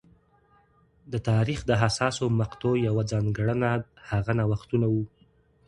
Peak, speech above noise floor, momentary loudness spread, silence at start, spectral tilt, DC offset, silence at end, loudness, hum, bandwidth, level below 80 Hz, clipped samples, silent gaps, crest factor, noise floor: -6 dBFS; 37 dB; 7 LU; 1.1 s; -6.5 dB/octave; under 0.1%; 0.6 s; -26 LUFS; none; 11 kHz; -50 dBFS; under 0.1%; none; 20 dB; -62 dBFS